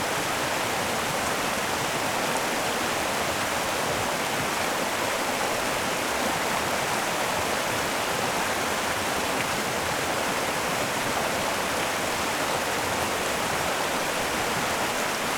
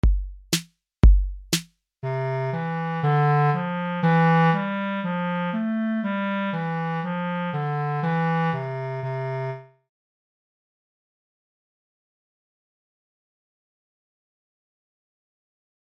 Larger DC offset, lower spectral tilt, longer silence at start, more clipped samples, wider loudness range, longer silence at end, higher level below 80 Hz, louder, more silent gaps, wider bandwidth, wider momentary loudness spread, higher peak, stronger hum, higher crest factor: neither; second, -2.5 dB/octave vs -6 dB/octave; about the same, 0 s vs 0.05 s; neither; second, 0 LU vs 11 LU; second, 0 s vs 6.35 s; second, -54 dBFS vs -30 dBFS; about the same, -26 LUFS vs -24 LUFS; neither; first, over 20 kHz vs 16 kHz; second, 1 LU vs 10 LU; second, -10 dBFS vs -4 dBFS; neither; about the same, 16 dB vs 20 dB